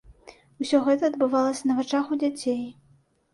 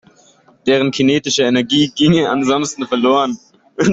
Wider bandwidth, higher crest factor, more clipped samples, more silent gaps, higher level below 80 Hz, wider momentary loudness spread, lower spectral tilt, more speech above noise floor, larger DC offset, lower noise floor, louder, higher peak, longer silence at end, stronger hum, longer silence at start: first, 11.5 kHz vs 8 kHz; about the same, 16 dB vs 14 dB; neither; neither; second, -62 dBFS vs -52 dBFS; about the same, 9 LU vs 8 LU; about the same, -4.5 dB/octave vs -4.5 dB/octave; about the same, 38 dB vs 36 dB; neither; first, -62 dBFS vs -50 dBFS; second, -25 LUFS vs -15 LUFS; second, -10 dBFS vs -2 dBFS; first, 0.6 s vs 0 s; neither; second, 0.1 s vs 0.65 s